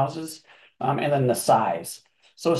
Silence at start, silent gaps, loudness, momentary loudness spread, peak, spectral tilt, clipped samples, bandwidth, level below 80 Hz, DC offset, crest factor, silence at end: 0 s; none; -24 LUFS; 17 LU; -6 dBFS; -5.5 dB/octave; under 0.1%; 13 kHz; -68 dBFS; under 0.1%; 18 dB; 0 s